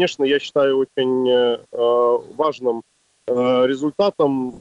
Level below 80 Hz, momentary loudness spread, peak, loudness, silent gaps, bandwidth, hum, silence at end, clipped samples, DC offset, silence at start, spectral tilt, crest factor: -64 dBFS; 7 LU; -8 dBFS; -19 LUFS; none; 8 kHz; none; 0 s; under 0.1%; under 0.1%; 0 s; -5.5 dB/octave; 12 dB